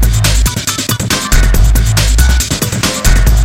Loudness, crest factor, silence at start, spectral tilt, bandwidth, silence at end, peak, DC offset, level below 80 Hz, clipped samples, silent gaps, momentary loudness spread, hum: -11 LUFS; 10 dB; 0 s; -3.5 dB/octave; 16.5 kHz; 0 s; 0 dBFS; under 0.1%; -10 dBFS; under 0.1%; none; 3 LU; none